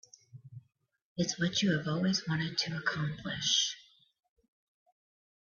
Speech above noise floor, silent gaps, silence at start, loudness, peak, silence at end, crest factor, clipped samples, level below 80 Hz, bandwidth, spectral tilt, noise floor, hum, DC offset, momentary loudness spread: 39 dB; 1.02-1.16 s; 0.35 s; -31 LUFS; -16 dBFS; 1.65 s; 20 dB; under 0.1%; -68 dBFS; 7.4 kHz; -3.5 dB/octave; -71 dBFS; none; under 0.1%; 16 LU